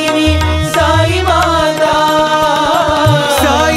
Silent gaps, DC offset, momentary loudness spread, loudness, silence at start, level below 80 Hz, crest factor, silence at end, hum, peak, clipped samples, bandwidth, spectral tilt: none; under 0.1%; 1 LU; -11 LUFS; 0 s; -24 dBFS; 10 dB; 0 s; none; 0 dBFS; under 0.1%; 16 kHz; -4.5 dB/octave